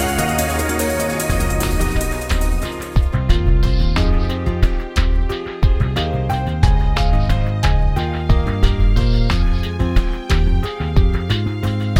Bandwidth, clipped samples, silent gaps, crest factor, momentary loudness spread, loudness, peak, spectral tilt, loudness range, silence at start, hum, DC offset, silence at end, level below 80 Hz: 16.5 kHz; under 0.1%; none; 16 dB; 4 LU; -19 LUFS; 0 dBFS; -5.5 dB/octave; 1 LU; 0 s; none; under 0.1%; 0 s; -18 dBFS